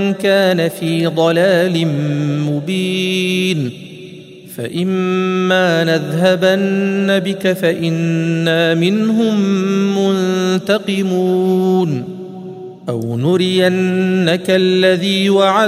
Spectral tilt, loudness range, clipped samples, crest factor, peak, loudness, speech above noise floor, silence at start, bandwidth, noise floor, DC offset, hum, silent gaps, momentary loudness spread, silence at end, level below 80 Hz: -6 dB/octave; 2 LU; under 0.1%; 14 dB; 0 dBFS; -15 LUFS; 21 dB; 0 s; 15.5 kHz; -35 dBFS; under 0.1%; none; none; 10 LU; 0 s; -62 dBFS